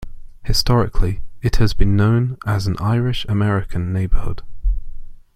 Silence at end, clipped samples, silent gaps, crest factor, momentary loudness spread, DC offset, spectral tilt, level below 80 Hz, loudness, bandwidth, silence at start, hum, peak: 0.15 s; under 0.1%; none; 16 dB; 10 LU; under 0.1%; -6.5 dB/octave; -22 dBFS; -20 LUFS; 14.5 kHz; 0 s; none; -2 dBFS